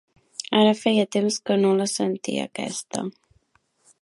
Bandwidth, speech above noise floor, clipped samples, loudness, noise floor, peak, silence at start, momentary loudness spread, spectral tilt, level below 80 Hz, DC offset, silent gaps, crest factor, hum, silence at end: 11.5 kHz; 44 dB; under 0.1%; -23 LUFS; -66 dBFS; -4 dBFS; 0.5 s; 12 LU; -4.5 dB/octave; -70 dBFS; under 0.1%; none; 20 dB; none; 0.9 s